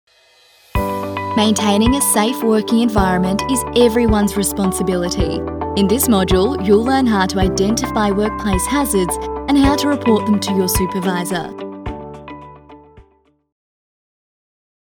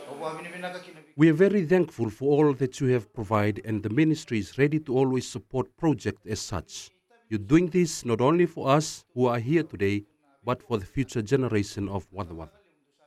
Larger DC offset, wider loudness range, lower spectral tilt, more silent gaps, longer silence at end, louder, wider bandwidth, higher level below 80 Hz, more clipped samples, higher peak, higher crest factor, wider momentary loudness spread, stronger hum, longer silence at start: neither; first, 8 LU vs 4 LU; second, -4.5 dB/octave vs -6.5 dB/octave; neither; first, 1.9 s vs 0.6 s; first, -16 LUFS vs -26 LUFS; first, over 20 kHz vs 14 kHz; first, -32 dBFS vs -54 dBFS; neither; first, 0 dBFS vs -8 dBFS; about the same, 16 dB vs 18 dB; second, 9 LU vs 14 LU; neither; first, 0.75 s vs 0 s